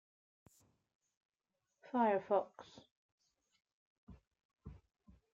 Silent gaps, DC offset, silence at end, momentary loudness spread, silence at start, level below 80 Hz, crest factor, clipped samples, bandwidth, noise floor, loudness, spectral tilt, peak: 2.91-3.18 s, 3.73-4.07 s, 4.27-4.31 s, 4.45-4.49 s; under 0.1%; 0.55 s; 25 LU; 1.95 s; -72 dBFS; 22 dB; under 0.1%; 8.4 kHz; -89 dBFS; -36 LUFS; -7 dB/octave; -22 dBFS